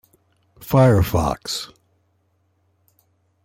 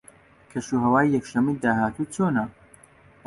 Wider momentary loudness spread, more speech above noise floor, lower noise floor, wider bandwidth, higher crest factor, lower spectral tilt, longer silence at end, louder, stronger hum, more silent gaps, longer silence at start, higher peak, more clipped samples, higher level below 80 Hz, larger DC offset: first, 20 LU vs 13 LU; first, 48 dB vs 31 dB; first, -65 dBFS vs -54 dBFS; first, 16.5 kHz vs 11.5 kHz; about the same, 18 dB vs 18 dB; about the same, -6.5 dB/octave vs -7 dB/octave; first, 1.8 s vs 0.75 s; first, -19 LUFS vs -24 LUFS; neither; neither; about the same, 0.6 s vs 0.55 s; about the same, -6 dBFS vs -8 dBFS; neither; first, -40 dBFS vs -56 dBFS; neither